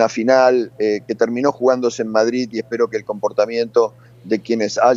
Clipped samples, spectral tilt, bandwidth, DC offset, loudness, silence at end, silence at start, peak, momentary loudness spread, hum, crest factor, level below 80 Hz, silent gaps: under 0.1%; -4.5 dB/octave; 7.8 kHz; under 0.1%; -18 LUFS; 0 s; 0 s; 0 dBFS; 9 LU; none; 18 dB; -66 dBFS; none